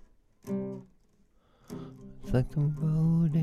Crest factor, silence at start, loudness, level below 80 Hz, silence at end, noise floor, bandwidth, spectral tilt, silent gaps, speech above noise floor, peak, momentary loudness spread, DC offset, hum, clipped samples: 20 dB; 0.45 s; -30 LUFS; -46 dBFS; 0 s; -64 dBFS; 6.8 kHz; -9.5 dB/octave; none; 38 dB; -12 dBFS; 20 LU; under 0.1%; none; under 0.1%